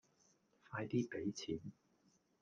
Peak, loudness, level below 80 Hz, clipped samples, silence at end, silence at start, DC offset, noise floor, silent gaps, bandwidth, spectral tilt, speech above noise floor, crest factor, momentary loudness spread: -26 dBFS; -44 LUFS; -76 dBFS; under 0.1%; 0.7 s; 0.7 s; under 0.1%; -76 dBFS; none; 9.2 kHz; -6 dB/octave; 34 dB; 20 dB; 9 LU